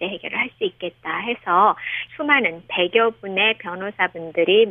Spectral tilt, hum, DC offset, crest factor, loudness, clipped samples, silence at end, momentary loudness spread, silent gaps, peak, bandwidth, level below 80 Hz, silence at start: -7 dB/octave; none; under 0.1%; 18 dB; -20 LUFS; under 0.1%; 0 s; 10 LU; none; -2 dBFS; 3.8 kHz; -64 dBFS; 0 s